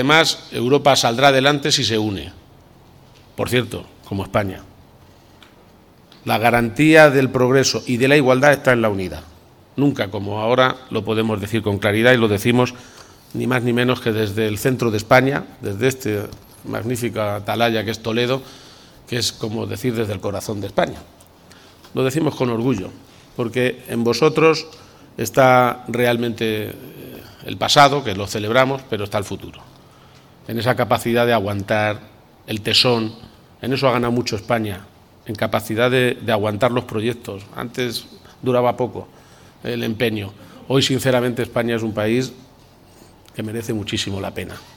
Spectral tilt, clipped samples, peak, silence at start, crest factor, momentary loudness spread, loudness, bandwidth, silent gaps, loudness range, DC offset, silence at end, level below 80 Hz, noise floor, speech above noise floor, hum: -5 dB/octave; under 0.1%; 0 dBFS; 0 s; 20 dB; 16 LU; -18 LUFS; 19 kHz; none; 7 LU; under 0.1%; 0.15 s; -50 dBFS; -49 dBFS; 30 dB; none